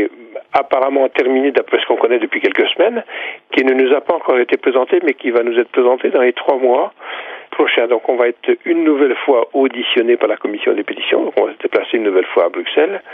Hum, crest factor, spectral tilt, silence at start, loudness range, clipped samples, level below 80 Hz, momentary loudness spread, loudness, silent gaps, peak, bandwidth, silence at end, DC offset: none; 14 dB; -5.5 dB/octave; 0 s; 1 LU; under 0.1%; -72 dBFS; 5 LU; -15 LUFS; none; 0 dBFS; 5 kHz; 0 s; under 0.1%